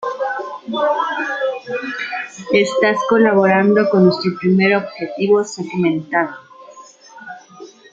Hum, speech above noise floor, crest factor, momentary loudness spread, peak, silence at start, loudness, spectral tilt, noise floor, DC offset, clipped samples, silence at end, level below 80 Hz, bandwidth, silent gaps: none; 26 dB; 16 dB; 13 LU; -2 dBFS; 0 s; -17 LUFS; -6 dB/octave; -41 dBFS; under 0.1%; under 0.1%; 0.25 s; -62 dBFS; 7.8 kHz; none